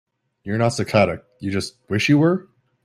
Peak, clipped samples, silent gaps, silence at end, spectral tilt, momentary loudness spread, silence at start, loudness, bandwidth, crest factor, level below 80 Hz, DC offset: -2 dBFS; under 0.1%; none; 0.4 s; -6 dB/octave; 11 LU; 0.45 s; -20 LUFS; 14.5 kHz; 18 dB; -56 dBFS; under 0.1%